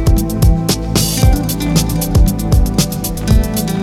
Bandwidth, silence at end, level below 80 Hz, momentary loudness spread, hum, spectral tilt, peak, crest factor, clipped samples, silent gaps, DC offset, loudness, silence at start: 17 kHz; 0 s; -16 dBFS; 3 LU; none; -5 dB/octave; 0 dBFS; 12 dB; under 0.1%; none; under 0.1%; -14 LUFS; 0 s